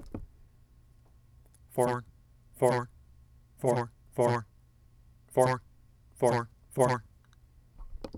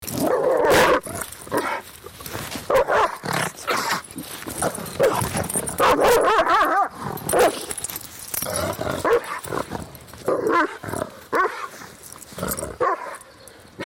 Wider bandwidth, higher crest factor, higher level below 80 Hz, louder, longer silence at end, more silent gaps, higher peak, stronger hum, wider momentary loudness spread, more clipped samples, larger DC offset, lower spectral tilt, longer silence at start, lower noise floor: about the same, 18.5 kHz vs 17 kHz; first, 22 dB vs 14 dB; second, -54 dBFS vs -48 dBFS; second, -30 LUFS vs -22 LUFS; about the same, 0 s vs 0 s; neither; about the same, -10 dBFS vs -8 dBFS; neither; about the same, 18 LU vs 16 LU; neither; neither; first, -6 dB/octave vs -3.5 dB/octave; about the same, 0 s vs 0 s; first, -60 dBFS vs -46 dBFS